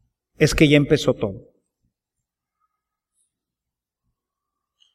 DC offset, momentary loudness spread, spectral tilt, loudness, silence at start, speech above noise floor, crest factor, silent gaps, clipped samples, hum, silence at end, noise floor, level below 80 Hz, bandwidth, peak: under 0.1%; 11 LU; -5.5 dB/octave; -18 LUFS; 0.4 s; 69 dB; 22 dB; none; under 0.1%; none; 3.55 s; -86 dBFS; -42 dBFS; 15 kHz; -2 dBFS